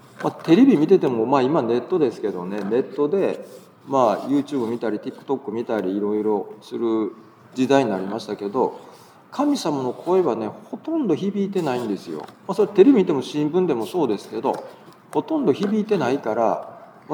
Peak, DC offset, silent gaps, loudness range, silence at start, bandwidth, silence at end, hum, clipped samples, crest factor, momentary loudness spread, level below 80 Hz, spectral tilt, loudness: -2 dBFS; under 0.1%; none; 4 LU; 0.2 s; 16.5 kHz; 0 s; none; under 0.1%; 20 dB; 12 LU; -80 dBFS; -7 dB/octave; -21 LUFS